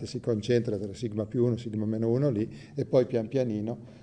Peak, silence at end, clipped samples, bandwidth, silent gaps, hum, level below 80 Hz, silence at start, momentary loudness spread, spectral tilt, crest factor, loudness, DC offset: -10 dBFS; 0 s; under 0.1%; 9.8 kHz; none; none; -62 dBFS; 0 s; 8 LU; -8 dB/octave; 18 dB; -29 LUFS; under 0.1%